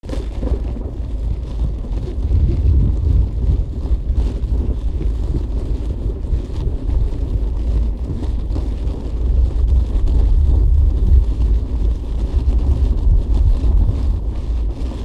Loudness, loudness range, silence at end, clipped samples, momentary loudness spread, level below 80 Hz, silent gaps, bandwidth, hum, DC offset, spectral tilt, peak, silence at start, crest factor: -20 LUFS; 5 LU; 0 s; under 0.1%; 8 LU; -16 dBFS; none; 5 kHz; none; under 0.1%; -9 dB/octave; -2 dBFS; 0.05 s; 14 dB